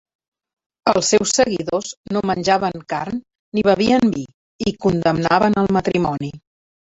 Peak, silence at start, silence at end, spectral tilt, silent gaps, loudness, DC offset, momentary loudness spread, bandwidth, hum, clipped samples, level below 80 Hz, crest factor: -2 dBFS; 0.85 s; 0.55 s; -4.5 dB/octave; 1.97-2.04 s, 3.39-3.52 s, 4.34-4.59 s; -19 LUFS; under 0.1%; 11 LU; 8.2 kHz; none; under 0.1%; -48 dBFS; 18 dB